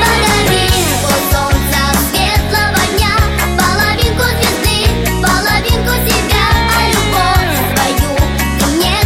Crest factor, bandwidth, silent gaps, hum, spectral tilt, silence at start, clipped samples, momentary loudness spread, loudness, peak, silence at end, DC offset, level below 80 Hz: 12 dB; 16.5 kHz; none; none; -4 dB/octave; 0 s; under 0.1%; 3 LU; -11 LUFS; 0 dBFS; 0 s; under 0.1%; -18 dBFS